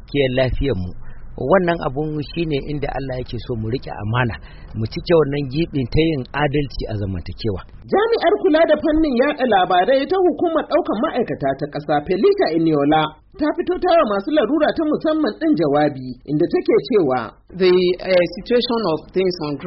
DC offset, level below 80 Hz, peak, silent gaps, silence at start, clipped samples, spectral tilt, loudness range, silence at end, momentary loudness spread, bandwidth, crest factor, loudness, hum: under 0.1%; -36 dBFS; -2 dBFS; none; 0 s; under 0.1%; -5 dB/octave; 5 LU; 0 s; 10 LU; 5.8 kHz; 16 dB; -19 LUFS; none